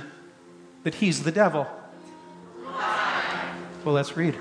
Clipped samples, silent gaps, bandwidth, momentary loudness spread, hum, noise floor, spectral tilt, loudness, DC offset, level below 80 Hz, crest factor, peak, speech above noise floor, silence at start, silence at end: under 0.1%; none; 10.5 kHz; 23 LU; none; -50 dBFS; -5 dB/octave; -26 LUFS; under 0.1%; -70 dBFS; 20 dB; -8 dBFS; 26 dB; 0 s; 0 s